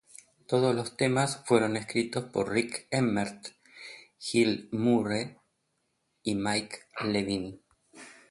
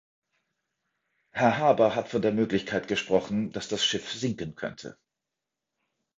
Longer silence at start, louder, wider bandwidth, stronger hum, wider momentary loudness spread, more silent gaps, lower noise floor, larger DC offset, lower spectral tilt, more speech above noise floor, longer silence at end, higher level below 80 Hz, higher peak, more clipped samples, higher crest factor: second, 0.5 s vs 1.35 s; about the same, -29 LUFS vs -27 LUFS; first, 11.5 kHz vs 7.8 kHz; neither; first, 19 LU vs 15 LU; neither; second, -77 dBFS vs -87 dBFS; neither; about the same, -5 dB/octave vs -4.5 dB/octave; second, 49 dB vs 60 dB; second, 0.2 s vs 1.25 s; about the same, -64 dBFS vs -62 dBFS; second, -10 dBFS vs -6 dBFS; neither; about the same, 20 dB vs 22 dB